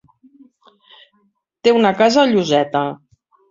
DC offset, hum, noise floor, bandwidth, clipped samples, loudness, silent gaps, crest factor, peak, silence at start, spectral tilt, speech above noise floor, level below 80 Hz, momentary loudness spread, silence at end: under 0.1%; none; -63 dBFS; 7.6 kHz; under 0.1%; -15 LUFS; none; 16 dB; -2 dBFS; 1.65 s; -5 dB/octave; 49 dB; -62 dBFS; 10 LU; 0.55 s